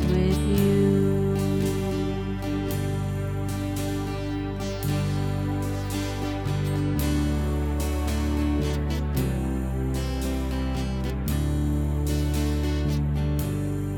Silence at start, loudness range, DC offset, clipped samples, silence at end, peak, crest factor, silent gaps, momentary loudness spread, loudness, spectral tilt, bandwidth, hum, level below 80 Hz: 0 s; 3 LU; under 0.1%; under 0.1%; 0 s; -10 dBFS; 14 dB; none; 6 LU; -26 LUFS; -7 dB/octave; 18.5 kHz; none; -30 dBFS